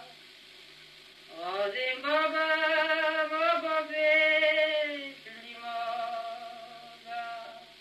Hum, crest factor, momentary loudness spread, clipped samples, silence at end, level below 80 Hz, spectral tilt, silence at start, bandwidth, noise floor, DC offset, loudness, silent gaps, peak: 50 Hz at -80 dBFS; 16 dB; 23 LU; under 0.1%; 0.05 s; -82 dBFS; -2 dB/octave; 0 s; 13.5 kHz; -53 dBFS; under 0.1%; -28 LUFS; none; -14 dBFS